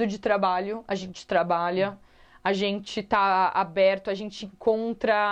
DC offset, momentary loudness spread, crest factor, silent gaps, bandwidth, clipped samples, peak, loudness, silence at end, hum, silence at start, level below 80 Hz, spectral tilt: under 0.1%; 9 LU; 16 dB; none; 8.8 kHz; under 0.1%; -10 dBFS; -26 LUFS; 0 s; none; 0 s; -60 dBFS; -5.5 dB/octave